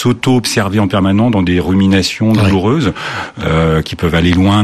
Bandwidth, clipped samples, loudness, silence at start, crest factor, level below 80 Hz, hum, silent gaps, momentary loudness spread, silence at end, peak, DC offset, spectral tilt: 14 kHz; under 0.1%; -12 LUFS; 0 s; 12 dB; -34 dBFS; none; none; 5 LU; 0 s; 0 dBFS; under 0.1%; -6 dB/octave